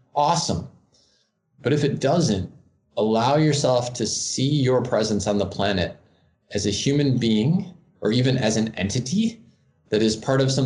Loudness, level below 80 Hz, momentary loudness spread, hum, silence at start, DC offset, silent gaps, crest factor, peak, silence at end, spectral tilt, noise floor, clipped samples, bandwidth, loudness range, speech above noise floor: -22 LUFS; -56 dBFS; 8 LU; none; 0.15 s; under 0.1%; none; 16 dB; -8 dBFS; 0 s; -5 dB/octave; -66 dBFS; under 0.1%; 11 kHz; 2 LU; 45 dB